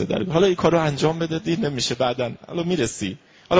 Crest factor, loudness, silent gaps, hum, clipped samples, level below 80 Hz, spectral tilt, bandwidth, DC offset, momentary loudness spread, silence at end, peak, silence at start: 18 dB; -22 LUFS; none; none; under 0.1%; -50 dBFS; -5.5 dB/octave; 8 kHz; under 0.1%; 9 LU; 0 s; -4 dBFS; 0 s